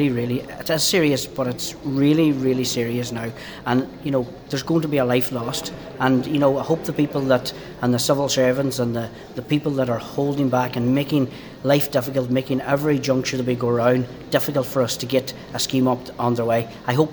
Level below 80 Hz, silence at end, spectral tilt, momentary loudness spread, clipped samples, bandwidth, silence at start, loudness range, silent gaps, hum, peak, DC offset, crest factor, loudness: -52 dBFS; 0 s; -5.5 dB/octave; 8 LU; under 0.1%; over 20 kHz; 0 s; 2 LU; none; none; -2 dBFS; under 0.1%; 18 dB; -21 LUFS